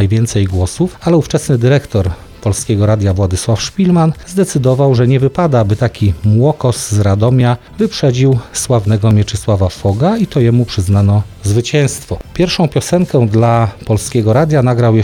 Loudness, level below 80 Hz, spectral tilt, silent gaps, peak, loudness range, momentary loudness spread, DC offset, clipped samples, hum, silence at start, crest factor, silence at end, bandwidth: -13 LUFS; -34 dBFS; -6.5 dB/octave; none; -2 dBFS; 2 LU; 5 LU; under 0.1%; under 0.1%; none; 0 s; 10 dB; 0 s; 14 kHz